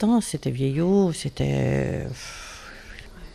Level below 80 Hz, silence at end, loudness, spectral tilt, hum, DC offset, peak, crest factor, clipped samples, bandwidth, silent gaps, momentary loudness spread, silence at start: -44 dBFS; 0 s; -24 LUFS; -6.5 dB/octave; none; under 0.1%; -10 dBFS; 14 dB; under 0.1%; 14 kHz; none; 20 LU; 0 s